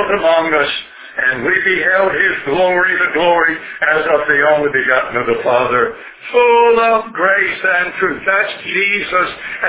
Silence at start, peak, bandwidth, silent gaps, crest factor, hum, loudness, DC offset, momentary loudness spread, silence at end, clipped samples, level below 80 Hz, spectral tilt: 0 s; 0 dBFS; 4 kHz; none; 14 dB; none; -13 LUFS; under 0.1%; 5 LU; 0 s; under 0.1%; -50 dBFS; -7.5 dB/octave